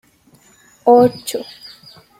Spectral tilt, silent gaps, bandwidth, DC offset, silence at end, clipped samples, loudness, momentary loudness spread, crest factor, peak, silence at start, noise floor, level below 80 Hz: -5.5 dB/octave; none; 16 kHz; under 0.1%; 0.75 s; under 0.1%; -15 LUFS; 25 LU; 16 dB; -2 dBFS; 0.85 s; -52 dBFS; -60 dBFS